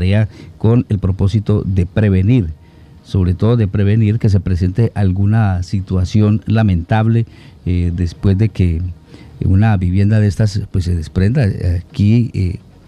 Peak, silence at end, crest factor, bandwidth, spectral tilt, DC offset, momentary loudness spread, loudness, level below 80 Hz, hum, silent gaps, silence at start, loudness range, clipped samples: 0 dBFS; 0.3 s; 14 dB; 8.8 kHz; -8.5 dB/octave; under 0.1%; 6 LU; -15 LUFS; -32 dBFS; none; none; 0 s; 1 LU; under 0.1%